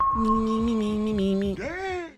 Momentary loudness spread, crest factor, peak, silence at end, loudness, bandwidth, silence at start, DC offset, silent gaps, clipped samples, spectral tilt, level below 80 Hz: 7 LU; 12 dB; -12 dBFS; 0.05 s; -25 LUFS; 10.5 kHz; 0 s; under 0.1%; none; under 0.1%; -7 dB/octave; -40 dBFS